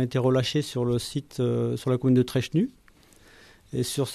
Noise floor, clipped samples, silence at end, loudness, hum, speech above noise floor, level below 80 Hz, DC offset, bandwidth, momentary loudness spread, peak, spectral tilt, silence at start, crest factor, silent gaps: -55 dBFS; under 0.1%; 0 s; -26 LUFS; none; 31 dB; -56 dBFS; under 0.1%; 14 kHz; 8 LU; -12 dBFS; -6.5 dB/octave; 0 s; 14 dB; none